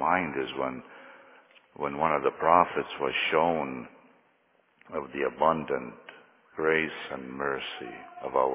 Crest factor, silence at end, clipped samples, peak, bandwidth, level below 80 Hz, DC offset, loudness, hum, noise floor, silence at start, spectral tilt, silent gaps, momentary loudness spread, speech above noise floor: 24 dB; 0 s; under 0.1%; -4 dBFS; 3.9 kHz; -62 dBFS; under 0.1%; -28 LUFS; none; -67 dBFS; 0 s; -2.5 dB/octave; none; 19 LU; 39 dB